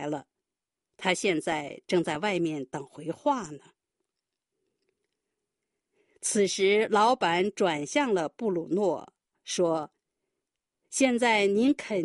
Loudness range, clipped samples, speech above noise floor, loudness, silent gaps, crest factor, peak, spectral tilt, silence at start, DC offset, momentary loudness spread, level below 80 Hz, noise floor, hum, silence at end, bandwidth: 11 LU; under 0.1%; 63 dB; -27 LUFS; none; 20 dB; -10 dBFS; -4 dB/octave; 0 s; under 0.1%; 13 LU; -72 dBFS; -89 dBFS; none; 0 s; 11.5 kHz